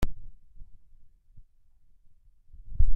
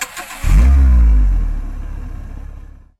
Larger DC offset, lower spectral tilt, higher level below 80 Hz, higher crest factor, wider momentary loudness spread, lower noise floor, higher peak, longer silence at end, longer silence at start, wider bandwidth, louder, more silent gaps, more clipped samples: neither; about the same, -7 dB/octave vs -6 dB/octave; second, -32 dBFS vs -14 dBFS; first, 18 dB vs 12 dB; first, 25 LU vs 21 LU; first, -57 dBFS vs -35 dBFS; second, -8 dBFS vs -2 dBFS; second, 0 s vs 0.4 s; about the same, 0 s vs 0 s; second, 3.3 kHz vs 13.5 kHz; second, -38 LUFS vs -15 LUFS; neither; neither